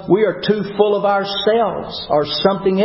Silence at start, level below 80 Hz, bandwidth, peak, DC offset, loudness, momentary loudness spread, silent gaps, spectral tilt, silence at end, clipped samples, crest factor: 0 s; -50 dBFS; 5.8 kHz; 0 dBFS; under 0.1%; -17 LUFS; 4 LU; none; -9.5 dB/octave; 0 s; under 0.1%; 16 dB